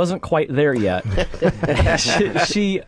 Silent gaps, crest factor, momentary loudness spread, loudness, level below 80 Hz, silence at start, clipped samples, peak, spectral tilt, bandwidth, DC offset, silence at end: none; 16 dB; 4 LU; -19 LUFS; -32 dBFS; 0 s; under 0.1%; -4 dBFS; -5 dB/octave; 11 kHz; under 0.1%; 0.05 s